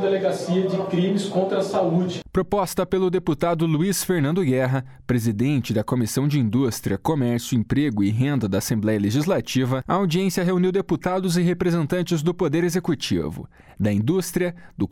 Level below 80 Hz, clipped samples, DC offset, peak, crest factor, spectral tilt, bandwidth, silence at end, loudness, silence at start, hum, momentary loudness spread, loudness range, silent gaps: -48 dBFS; under 0.1%; under 0.1%; -8 dBFS; 12 dB; -6 dB/octave; 18 kHz; 0.05 s; -22 LUFS; 0 s; none; 3 LU; 1 LU; none